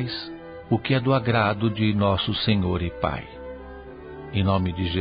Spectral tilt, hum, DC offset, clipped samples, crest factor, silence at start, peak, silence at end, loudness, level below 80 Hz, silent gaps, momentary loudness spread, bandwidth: -11 dB/octave; none; under 0.1%; under 0.1%; 18 dB; 0 s; -6 dBFS; 0 s; -24 LUFS; -40 dBFS; none; 18 LU; 5.2 kHz